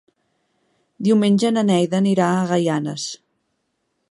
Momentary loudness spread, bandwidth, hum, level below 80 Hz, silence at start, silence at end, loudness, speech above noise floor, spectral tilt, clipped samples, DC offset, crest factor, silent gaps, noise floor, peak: 11 LU; 11.5 kHz; none; -68 dBFS; 1 s; 0.95 s; -19 LUFS; 54 dB; -6 dB/octave; under 0.1%; under 0.1%; 16 dB; none; -72 dBFS; -4 dBFS